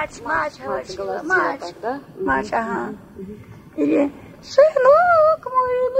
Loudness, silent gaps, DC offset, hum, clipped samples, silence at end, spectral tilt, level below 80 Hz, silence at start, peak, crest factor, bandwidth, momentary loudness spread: -19 LUFS; none; under 0.1%; none; under 0.1%; 0 s; -5.5 dB/octave; -52 dBFS; 0 s; -2 dBFS; 18 dB; 9.2 kHz; 17 LU